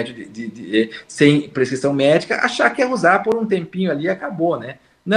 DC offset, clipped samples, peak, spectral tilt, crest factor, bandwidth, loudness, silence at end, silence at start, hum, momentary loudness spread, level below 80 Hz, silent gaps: under 0.1%; under 0.1%; 0 dBFS; -5.5 dB/octave; 18 dB; 11 kHz; -18 LUFS; 0 s; 0 s; none; 15 LU; -62 dBFS; none